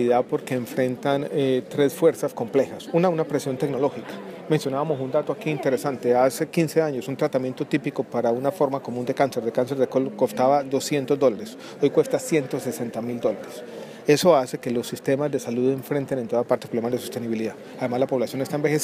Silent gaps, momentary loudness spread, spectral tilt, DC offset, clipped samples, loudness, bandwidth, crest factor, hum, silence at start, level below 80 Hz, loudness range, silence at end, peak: none; 8 LU; -6 dB/octave; under 0.1%; under 0.1%; -24 LUFS; 15.5 kHz; 18 dB; none; 0 s; -70 dBFS; 2 LU; 0 s; -4 dBFS